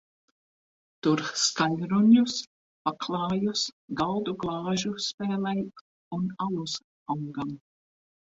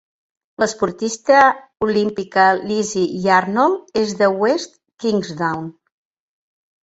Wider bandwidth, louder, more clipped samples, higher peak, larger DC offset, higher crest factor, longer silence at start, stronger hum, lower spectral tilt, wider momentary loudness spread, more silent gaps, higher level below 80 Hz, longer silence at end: about the same, 8 kHz vs 8.2 kHz; second, -28 LUFS vs -18 LUFS; neither; second, -10 dBFS vs -2 dBFS; neither; about the same, 20 dB vs 18 dB; first, 1.05 s vs 0.6 s; neither; about the same, -4.5 dB/octave vs -4.5 dB/octave; first, 13 LU vs 9 LU; first, 2.47-2.85 s, 3.72-3.88 s, 5.14-5.18 s, 5.81-6.11 s, 6.84-7.06 s vs none; second, -64 dBFS vs -58 dBFS; second, 0.75 s vs 1.1 s